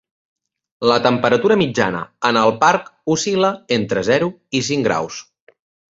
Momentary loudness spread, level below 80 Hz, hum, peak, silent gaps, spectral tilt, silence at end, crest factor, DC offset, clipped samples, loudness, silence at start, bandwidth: 7 LU; -56 dBFS; none; 0 dBFS; none; -4.5 dB/octave; 0.7 s; 18 dB; under 0.1%; under 0.1%; -17 LUFS; 0.8 s; 7.8 kHz